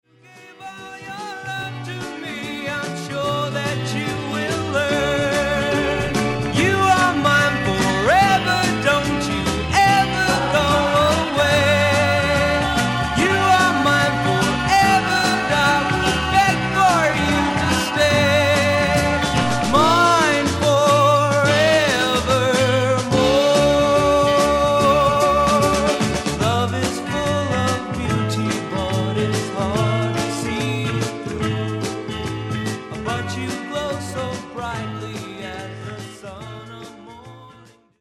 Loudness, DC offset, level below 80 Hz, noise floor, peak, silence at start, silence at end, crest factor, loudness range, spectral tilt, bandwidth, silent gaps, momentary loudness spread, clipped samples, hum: -18 LUFS; under 0.1%; -38 dBFS; -48 dBFS; -2 dBFS; 0.35 s; 0.5 s; 16 dB; 10 LU; -4.5 dB/octave; 17 kHz; none; 13 LU; under 0.1%; none